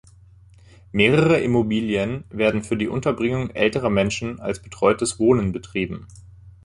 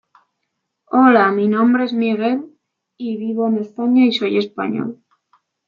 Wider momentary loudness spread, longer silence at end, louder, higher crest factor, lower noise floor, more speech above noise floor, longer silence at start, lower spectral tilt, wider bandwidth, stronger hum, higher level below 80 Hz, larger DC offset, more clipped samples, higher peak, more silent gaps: second, 10 LU vs 13 LU; second, 0.15 s vs 0.75 s; second, -21 LUFS vs -17 LUFS; about the same, 20 dB vs 16 dB; second, -49 dBFS vs -75 dBFS; second, 28 dB vs 59 dB; about the same, 0.95 s vs 0.9 s; second, -5.5 dB/octave vs -7.5 dB/octave; first, 11.5 kHz vs 6.6 kHz; neither; first, -46 dBFS vs -70 dBFS; neither; neither; about the same, -2 dBFS vs -2 dBFS; neither